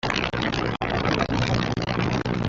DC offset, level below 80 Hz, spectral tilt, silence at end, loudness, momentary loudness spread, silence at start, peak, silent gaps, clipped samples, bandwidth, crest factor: under 0.1%; -40 dBFS; -6 dB/octave; 0 s; -24 LUFS; 2 LU; 0.05 s; -4 dBFS; none; under 0.1%; 7.6 kHz; 20 dB